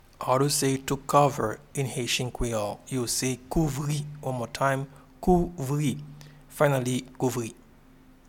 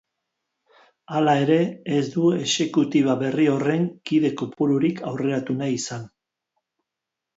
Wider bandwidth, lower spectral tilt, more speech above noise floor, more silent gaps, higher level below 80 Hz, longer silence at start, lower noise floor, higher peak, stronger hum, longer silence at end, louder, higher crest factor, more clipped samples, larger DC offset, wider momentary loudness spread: first, 18 kHz vs 8 kHz; about the same, -5 dB/octave vs -5.5 dB/octave; second, 27 dB vs 64 dB; neither; first, -44 dBFS vs -68 dBFS; second, 0.2 s vs 1.1 s; second, -54 dBFS vs -85 dBFS; about the same, -6 dBFS vs -6 dBFS; neither; second, 0.75 s vs 1.3 s; second, -27 LUFS vs -22 LUFS; first, 22 dB vs 16 dB; neither; neither; first, 9 LU vs 6 LU